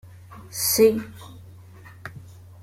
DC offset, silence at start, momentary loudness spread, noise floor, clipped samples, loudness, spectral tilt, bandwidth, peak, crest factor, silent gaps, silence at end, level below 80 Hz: under 0.1%; 0.05 s; 26 LU; -45 dBFS; under 0.1%; -20 LUFS; -3.5 dB/octave; 16.5 kHz; -6 dBFS; 20 dB; none; 0.4 s; -58 dBFS